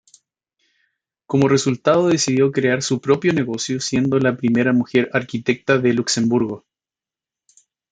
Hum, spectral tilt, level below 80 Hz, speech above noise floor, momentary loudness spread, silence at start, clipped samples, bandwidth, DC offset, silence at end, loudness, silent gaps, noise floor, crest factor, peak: none; -5 dB/octave; -60 dBFS; over 72 dB; 6 LU; 1.3 s; under 0.1%; 9.4 kHz; under 0.1%; 1.35 s; -18 LUFS; none; under -90 dBFS; 18 dB; -2 dBFS